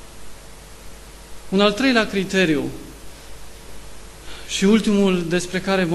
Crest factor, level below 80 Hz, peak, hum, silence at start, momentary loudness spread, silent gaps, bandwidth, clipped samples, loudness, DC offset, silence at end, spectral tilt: 18 dB; -44 dBFS; -2 dBFS; none; 0 s; 25 LU; none; 13 kHz; under 0.1%; -19 LUFS; under 0.1%; 0 s; -5 dB/octave